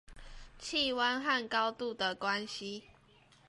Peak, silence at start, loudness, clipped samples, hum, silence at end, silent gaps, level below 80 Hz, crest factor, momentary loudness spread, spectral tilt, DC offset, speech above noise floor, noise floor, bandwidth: -18 dBFS; 0.1 s; -33 LUFS; under 0.1%; none; 0.6 s; none; -60 dBFS; 18 dB; 13 LU; -2.5 dB/octave; under 0.1%; 29 dB; -64 dBFS; 11.5 kHz